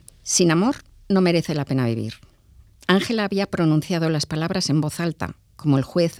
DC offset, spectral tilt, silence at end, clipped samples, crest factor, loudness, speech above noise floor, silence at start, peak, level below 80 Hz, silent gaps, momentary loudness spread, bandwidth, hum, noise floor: under 0.1%; -5 dB/octave; 0 s; under 0.1%; 18 dB; -21 LUFS; 31 dB; 0.25 s; -2 dBFS; -52 dBFS; none; 10 LU; 15 kHz; none; -52 dBFS